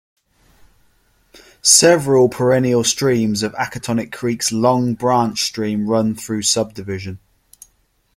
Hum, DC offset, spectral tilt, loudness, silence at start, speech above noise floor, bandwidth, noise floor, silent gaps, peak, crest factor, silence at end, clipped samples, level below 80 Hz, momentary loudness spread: none; under 0.1%; -3.5 dB/octave; -16 LUFS; 1.65 s; 45 dB; 16.5 kHz; -61 dBFS; none; 0 dBFS; 18 dB; 1 s; under 0.1%; -54 dBFS; 12 LU